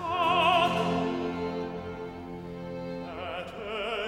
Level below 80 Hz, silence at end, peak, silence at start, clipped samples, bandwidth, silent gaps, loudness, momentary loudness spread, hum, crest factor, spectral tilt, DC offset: -56 dBFS; 0 s; -12 dBFS; 0 s; under 0.1%; 16 kHz; none; -29 LUFS; 16 LU; none; 18 dB; -5.5 dB/octave; under 0.1%